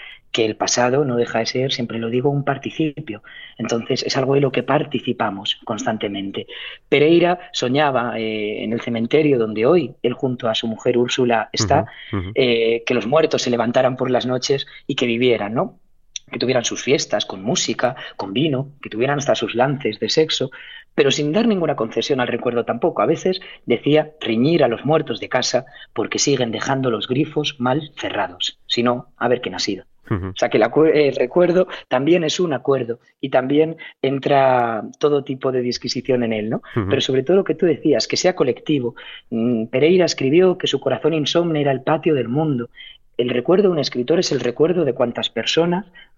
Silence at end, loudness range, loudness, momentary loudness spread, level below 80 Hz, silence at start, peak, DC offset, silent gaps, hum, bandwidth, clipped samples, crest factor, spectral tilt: 0.15 s; 3 LU; -19 LUFS; 8 LU; -56 dBFS; 0 s; -2 dBFS; under 0.1%; none; none; 7.8 kHz; under 0.1%; 16 dB; -5 dB/octave